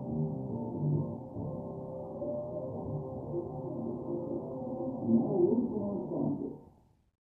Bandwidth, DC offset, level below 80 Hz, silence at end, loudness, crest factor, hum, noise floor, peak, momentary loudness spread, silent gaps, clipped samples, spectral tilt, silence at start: 1.4 kHz; under 0.1%; -60 dBFS; 0.6 s; -35 LUFS; 18 dB; none; -62 dBFS; -16 dBFS; 11 LU; none; under 0.1%; -14 dB/octave; 0 s